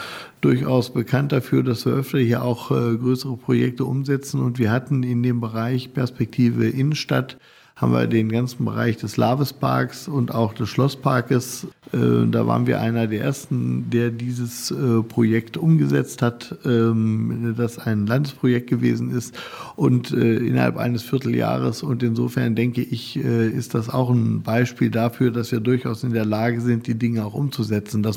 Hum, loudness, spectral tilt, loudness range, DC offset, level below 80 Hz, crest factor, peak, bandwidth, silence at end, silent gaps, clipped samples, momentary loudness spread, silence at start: none; -21 LUFS; -7 dB/octave; 1 LU; under 0.1%; -60 dBFS; 16 dB; -4 dBFS; 16.5 kHz; 0 s; none; under 0.1%; 5 LU; 0 s